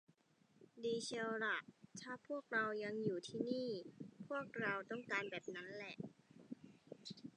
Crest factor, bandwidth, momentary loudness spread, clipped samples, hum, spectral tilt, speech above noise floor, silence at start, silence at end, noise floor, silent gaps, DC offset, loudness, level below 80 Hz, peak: 20 dB; 10 kHz; 16 LU; under 0.1%; none; -4.5 dB/octave; 30 dB; 0.6 s; 0.05 s; -75 dBFS; none; under 0.1%; -44 LUFS; -90 dBFS; -26 dBFS